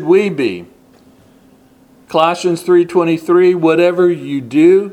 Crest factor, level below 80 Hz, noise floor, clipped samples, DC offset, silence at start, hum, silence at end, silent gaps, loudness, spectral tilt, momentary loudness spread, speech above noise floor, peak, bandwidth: 14 dB; -60 dBFS; -47 dBFS; under 0.1%; under 0.1%; 0 s; none; 0 s; none; -13 LUFS; -6.5 dB/octave; 9 LU; 35 dB; 0 dBFS; 12 kHz